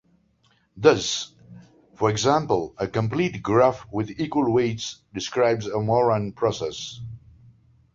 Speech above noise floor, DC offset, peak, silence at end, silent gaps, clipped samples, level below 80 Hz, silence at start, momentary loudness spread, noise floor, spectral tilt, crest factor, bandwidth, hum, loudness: 41 dB; under 0.1%; -4 dBFS; 0.75 s; none; under 0.1%; -54 dBFS; 0.75 s; 13 LU; -64 dBFS; -5 dB/octave; 20 dB; 7.8 kHz; none; -23 LUFS